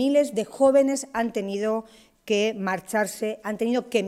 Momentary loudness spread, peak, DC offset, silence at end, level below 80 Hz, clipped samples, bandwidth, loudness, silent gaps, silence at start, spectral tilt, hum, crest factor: 9 LU; -8 dBFS; under 0.1%; 0 s; -64 dBFS; under 0.1%; 15.5 kHz; -24 LUFS; none; 0 s; -4.5 dB/octave; none; 16 dB